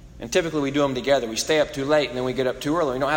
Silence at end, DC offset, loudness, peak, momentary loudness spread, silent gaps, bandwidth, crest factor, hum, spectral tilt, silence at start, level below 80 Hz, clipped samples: 0 s; under 0.1%; -23 LUFS; -8 dBFS; 3 LU; none; 16.5 kHz; 14 dB; none; -4 dB/octave; 0 s; -48 dBFS; under 0.1%